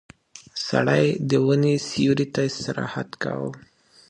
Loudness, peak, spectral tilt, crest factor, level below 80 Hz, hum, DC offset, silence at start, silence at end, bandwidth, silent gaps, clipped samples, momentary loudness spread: -23 LUFS; -4 dBFS; -6 dB/octave; 18 dB; -60 dBFS; none; under 0.1%; 0.35 s; 0.5 s; 9.8 kHz; none; under 0.1%; 11 LU